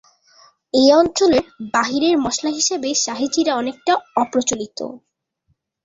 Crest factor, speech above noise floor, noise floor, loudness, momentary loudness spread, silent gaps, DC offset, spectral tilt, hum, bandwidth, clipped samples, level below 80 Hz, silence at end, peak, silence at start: 18 dB; 50 dB; -68 dBFS; -18 LUFS; 9 LU; none; under 0.1%; -2.5 dB/octave; none; 7.8 kHz; under 0.1%; -54 dBFS; 0.85 s; -2 dBFS; 0.75 s